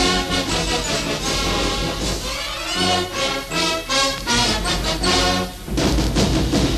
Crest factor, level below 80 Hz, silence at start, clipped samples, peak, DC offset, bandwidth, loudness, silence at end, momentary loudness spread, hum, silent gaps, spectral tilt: 14 dB; -28 dBFS; 0 s; under 0.1%; -6 dBFS; under 0.1%; 13.5 kHz; -19 LUFS; 0 s; 6 LU; none; none; -3.5 dB/octave